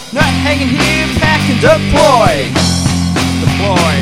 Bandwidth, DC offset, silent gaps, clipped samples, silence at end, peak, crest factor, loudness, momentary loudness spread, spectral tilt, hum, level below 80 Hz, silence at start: 16.5 kHz; under 0.1%; none; 0.3%; 0 s; 0 dBFS; 10 dB; -11 LUFS; 4 LU; -5 dB/octave; none; -28 dBFS; 0 s